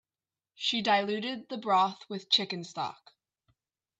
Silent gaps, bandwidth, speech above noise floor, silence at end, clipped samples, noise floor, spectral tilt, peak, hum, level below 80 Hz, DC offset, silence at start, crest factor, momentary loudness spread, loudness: none; 8.4 kHz; over 60 dB; 1.05 s; under 0.1%; under -90 dBFS; -3.5 dB/octave; -10 dBFS; none; -82 dBFS; under 0.1%; 0.6 s; 22 dB; 10 LU; -29 LUFS